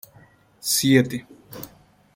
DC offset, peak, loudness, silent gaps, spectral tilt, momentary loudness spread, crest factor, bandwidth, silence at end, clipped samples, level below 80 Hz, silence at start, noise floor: under 0.1%; -2 dBFS; -20 LUFS; none; -4 dB/octave; 23 LU; 22 dB; 17 kHz; 0.5 s; under 0.1%; -60 dBFS; 0.65 s; -54 dBFS